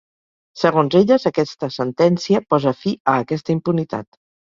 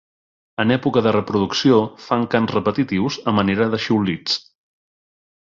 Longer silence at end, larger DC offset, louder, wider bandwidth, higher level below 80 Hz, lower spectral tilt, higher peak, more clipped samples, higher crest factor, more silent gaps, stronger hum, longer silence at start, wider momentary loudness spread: second, 0.5 s vs 1.15 s; neither; about the same, -18 LUFS vs -19 LUFS; about the same, 7.4 kHz vs 7.4 kHz; second, -58 dBFS vs -52 dBFS; about the same, -7 dB/octave vs -6 dB/octave; about the same, -2 dBFS vs -2 dBFS; neither; about the same, 18 dB vs 18 dB; first, 3.00-3.05 s vs none; neither; about the same, 0.55 s vs 0.6 s; first, 9 LU vs 6 LU